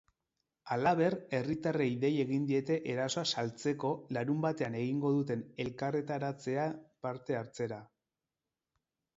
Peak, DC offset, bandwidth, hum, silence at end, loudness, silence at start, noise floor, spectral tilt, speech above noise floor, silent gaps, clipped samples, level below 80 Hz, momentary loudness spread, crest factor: -16 dBFS; under 0.1%; 8 kHz; none; 1.35 s; -34 LUFS; 0.65 s; under -90 dBFS; -6 dB/octave; over 56 dB; none; under 0.1%; -72 dBFS; 8 LU; 18 dB